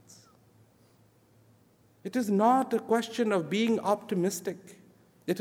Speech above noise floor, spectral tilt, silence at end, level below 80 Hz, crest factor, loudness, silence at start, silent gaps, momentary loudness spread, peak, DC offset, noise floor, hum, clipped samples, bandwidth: 35 dB; -5.5 dB/octave; 0 s; -80 dBFS; 20 dB; -28 LUFS; 0.1 s; none; 15 LU; -10 dBFS; under 0.1%; -63 dBFS; none; under 0.1%; 18 kHz